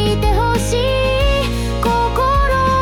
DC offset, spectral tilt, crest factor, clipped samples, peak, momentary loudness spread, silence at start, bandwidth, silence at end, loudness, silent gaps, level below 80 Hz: under 0.1%; -5 dB/octave; 10 dB; under 0.1%; -6 dBFS; 3 LU; 0 s; 17 kHz; 0 s; -16 LUFS; none; -20 dBFS